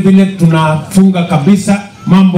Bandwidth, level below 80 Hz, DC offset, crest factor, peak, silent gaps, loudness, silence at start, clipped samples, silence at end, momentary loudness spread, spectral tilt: 12.5 kHz; -42 dBFS; under 0.1%; 8 dB; 0 dBFS; none; -9 LUFS; 0 s; 3%; 0 s; 3 LU; -7 dB/octave